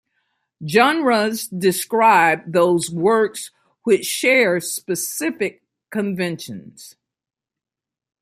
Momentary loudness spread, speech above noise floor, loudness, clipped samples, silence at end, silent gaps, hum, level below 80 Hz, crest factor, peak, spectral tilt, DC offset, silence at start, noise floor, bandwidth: 14 LU; 70 dB; -18 LUFS; under 0.1%; 1.3 s; none; none; -66 dBFS; 18 dB; -2 dBFS; -4 dB/octave; under 0.1%; 0.6 s; -88 dBFS; 16 kHz